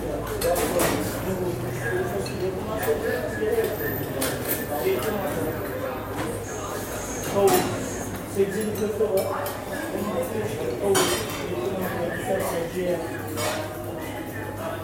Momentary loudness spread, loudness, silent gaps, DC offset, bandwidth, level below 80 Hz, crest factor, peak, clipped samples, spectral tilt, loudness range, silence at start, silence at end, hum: 8 LU; -26 LUFS; none; under 0.1%; 16.5 kHz; -46 dBFS; 18 dB; -8 dBFS; under 0.1%; -4.5 dB/octave; 2 LU; 0 s; 0 s; none